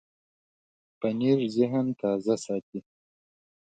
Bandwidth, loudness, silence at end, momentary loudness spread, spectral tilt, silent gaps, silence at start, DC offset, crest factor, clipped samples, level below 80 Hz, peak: 9.2 kHz; -27 LUFS; 0.95 s; 9 LU; -7 dB/octave; 2.63-2.72 s; 1 s; under 0.1%; 18 dB; under 0.1%; -74 dBFS; -10 dBFS